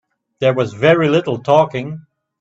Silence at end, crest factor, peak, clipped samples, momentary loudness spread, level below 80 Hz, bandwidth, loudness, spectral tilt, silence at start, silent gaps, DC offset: 0.4 s; 16 dB; 0 dBFS; under 0.1%; 13 LU; -56 dBFS; 8 kHz; -15 LUFS; -7 dB/octave; 0.4 s; none; under 0.1%